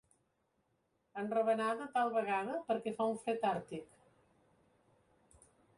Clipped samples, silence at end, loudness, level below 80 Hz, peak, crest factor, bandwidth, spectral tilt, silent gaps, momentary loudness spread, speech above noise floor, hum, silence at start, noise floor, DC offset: under 0.1%; 1.95 s; -36 LUFS; -80 dBFS; -22 dBFS; 16 dB; 11.5 kHz; -5.5 dB/octave; none; 11 LU; 44 dB; none; 1.15 s; -80 dBFS; under 0.1%